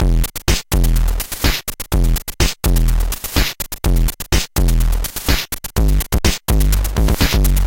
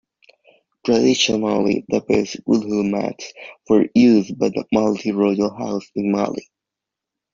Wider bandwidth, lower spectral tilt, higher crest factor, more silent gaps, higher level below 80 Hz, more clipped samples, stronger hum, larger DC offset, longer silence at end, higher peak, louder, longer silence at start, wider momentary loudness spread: first, 17.5 kHz vs 7.6 kHz; about the same, -4 dB/octave vs -5 dB/octave; about the same, 14 dB vs 16 dB; neither; first, -16 dBFS vs -56 dBFS; neither; neither; neither; second, 0 s vs 0.95 s; first, 0 dBFS vs -4 dBFS; about the same, -18 LUFS vs -19 LUFS; second, 0 s vs 0.85 s; second, 4 LU vs 12 LU